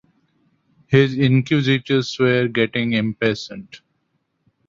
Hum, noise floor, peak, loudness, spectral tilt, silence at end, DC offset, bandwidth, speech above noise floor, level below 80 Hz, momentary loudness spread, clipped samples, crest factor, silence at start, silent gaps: none; -70 dBFS; -2 dBFS; -18 LUFS; -6.5 dB/octave; 0.9 s; under 0.1%; 7.6 kHz; 52 dB; -56 dBFS; 6 LU; under 0.1%; 18 dB; 0.9 s; none